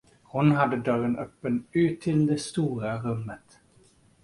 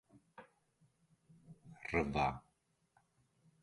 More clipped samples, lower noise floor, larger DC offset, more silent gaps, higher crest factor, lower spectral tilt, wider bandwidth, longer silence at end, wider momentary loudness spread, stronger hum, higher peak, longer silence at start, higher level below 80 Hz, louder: neither; second, -60 dBFS vs -78 dBFS; neither; neither; second, 18 dB vs 24 dB; about the same, -7 dB/octave vs -6.5 dB/octave; about the same, 11.5 kHz vs 11.5 kHz; second, 0.85 s vs 1.25 s; second, 11 LU vs 25 LU; neither; first, -8 dBFS vs -20 dBFS; about the same, 0.35 s vs 0.4 s; about the same, -58 dBFS vs -60 dBFS; first, -27 LUFS vs -38 LUFS